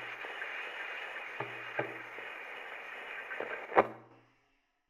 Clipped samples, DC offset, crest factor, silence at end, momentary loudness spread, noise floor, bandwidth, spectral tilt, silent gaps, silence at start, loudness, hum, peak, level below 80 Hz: under 0.1%; under 0.1%; 32 dB; 0.7 s; 13 LU; -75 dBFS; 15 kHz; -5 dB/octave; none; 0 s; -38 LUFS; none; -6 dBFS; -78 dBFS